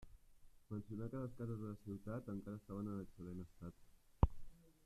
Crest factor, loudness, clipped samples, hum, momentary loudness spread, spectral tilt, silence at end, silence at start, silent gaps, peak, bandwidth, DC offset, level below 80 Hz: 30 dB; -47 LUFS; under 0.1%; none; 13 LU; -9.5 dB/octave; 0.15 s; 0 s; none; -16 dBFS; 14 kHz; under 0.1%; -52 dBFS